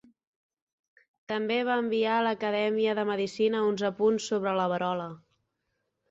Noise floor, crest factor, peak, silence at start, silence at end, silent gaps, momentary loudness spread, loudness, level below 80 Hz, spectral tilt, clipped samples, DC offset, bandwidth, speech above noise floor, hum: -80 dBFS; 14 dB; -14 dBFS; 1.3 s; 0.95 s; none; 6 LU; -28 LUFS; -74 dBFS; -5 dB/octave; under 0.1%; under 0.1%; 7.8 kHz; 52 dB; none